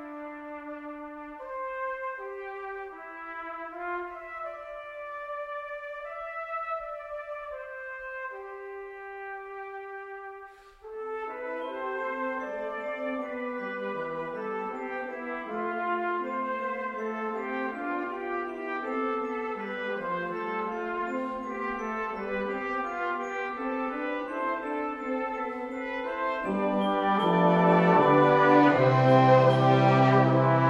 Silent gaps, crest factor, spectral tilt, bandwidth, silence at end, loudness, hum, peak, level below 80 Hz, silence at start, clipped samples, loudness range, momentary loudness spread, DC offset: none; 20 dB; -8 dB/octave; 7.6 kHz; 0 s; -28 LUFS; none; -8 dBFS; -62 dBFS; 0 s; under 0.1%; 15 LU; 19 LU; under 0.1%